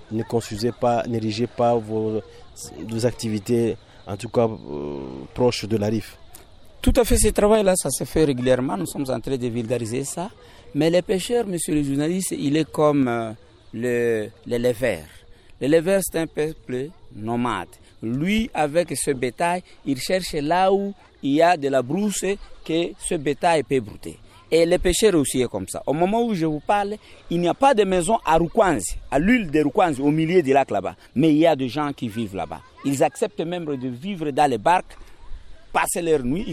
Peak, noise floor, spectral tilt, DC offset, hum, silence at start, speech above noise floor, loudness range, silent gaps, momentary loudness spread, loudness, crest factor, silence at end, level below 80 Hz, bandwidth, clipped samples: -6 dBFS; -44 dBFS; -5 dB/octave; under 0.1%; none; 0 s; 23 dB; 5 LU; none; 12 LU; -22 LUFS; 16 dB; 0 s; -40 dBFS; 15.5 kHz; under 0.1%